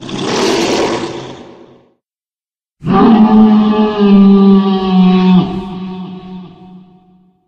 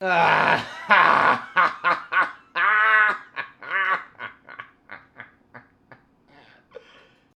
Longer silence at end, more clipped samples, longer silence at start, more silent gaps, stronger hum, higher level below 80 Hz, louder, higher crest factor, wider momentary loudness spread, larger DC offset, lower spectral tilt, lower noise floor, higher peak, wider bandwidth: second, 0.7 s vs 1.8 s; neither; about the same, 0 s vs 0 s; neither; neither; first, -42 dBFS vs -68 dBFS; first, -9 LUFS vs -20 LUFS; second, 12 dB vs 22 dB; second, 20 LU vs 23 LU; neither; first, -7 dB/octave vs -4 dB/octave; first, under -90 dBFS vs -55 dBFS; about the same, 0 dBFS vs 0 dBFS; second, 9 kHz vs 11 kHz